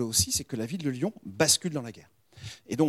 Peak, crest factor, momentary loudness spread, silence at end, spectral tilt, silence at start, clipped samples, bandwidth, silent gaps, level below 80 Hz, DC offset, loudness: -8 dBFS; 22 dB; 21 LU; 0 s; -3 dB/octave; 0 s; under 0.1%; 16 kHz; none; -54 dBFS; under 0.1%; -27 LUFS